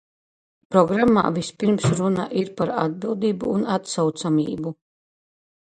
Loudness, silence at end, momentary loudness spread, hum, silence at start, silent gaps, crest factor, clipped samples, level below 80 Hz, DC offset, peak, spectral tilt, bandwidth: -22 LUFS; 1.05 s; 7 LU; none; 0.7 s; none; 20 dB; under 0.1%; -56 dBFS; under 0.1%; -2 dBFS; -6.5 dB/octave; 9.4 kHz